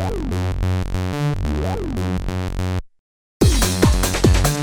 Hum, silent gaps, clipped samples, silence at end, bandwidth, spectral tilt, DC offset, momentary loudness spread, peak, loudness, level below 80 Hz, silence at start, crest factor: none; 2.99-3.40 s; under 0.1%; 0 s; over 20 kHz; -5 dB/octave; under 0.1%; 8 LU; 0 dBFS; -20 LUFS; -24 dBFS; 0 s; 18 dB